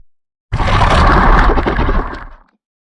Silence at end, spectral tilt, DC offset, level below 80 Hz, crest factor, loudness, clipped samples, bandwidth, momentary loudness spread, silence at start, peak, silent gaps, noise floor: 0.45 s; -6.5 dB/octave; under 0.1%; -16 dBFS; 12 dB; -13 LUFS; under 0.1%; 10.5 kHz; 15 LU; 0.5 s; 0 dBFS; none; -33 dBFS